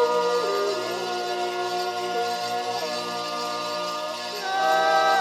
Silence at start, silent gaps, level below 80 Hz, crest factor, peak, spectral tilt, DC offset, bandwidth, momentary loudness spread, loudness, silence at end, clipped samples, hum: 0 s; none; -82 dBFS; 16 dB; -10 dBFS; -2 dB/octave; under 0.1%; 17.5 kHz; 8 LU; -25 LUFS; 0 s; under 0.1%; 60 Hz at -55 dBFS